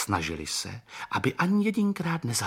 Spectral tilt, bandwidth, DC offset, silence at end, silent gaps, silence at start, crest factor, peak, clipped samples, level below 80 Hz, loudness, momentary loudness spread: -4.5 dB/octave; 16.5 kHz; under 0.1%; 0 s; none; 0 s; 16 dB; -12 dBFS; under 0.1%; -54 dBFS; -28 LUFS; 8 LU